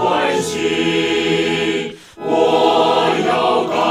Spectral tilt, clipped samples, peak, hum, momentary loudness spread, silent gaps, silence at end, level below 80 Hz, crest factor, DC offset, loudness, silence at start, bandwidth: -4 dB/octave; under 0.1%; -2 dBFS; none; 7 LU; none; 0 s; -56 dBFS; 14 dB; under 0.1%; -16 LUFS; 0 s; 15.5 kHz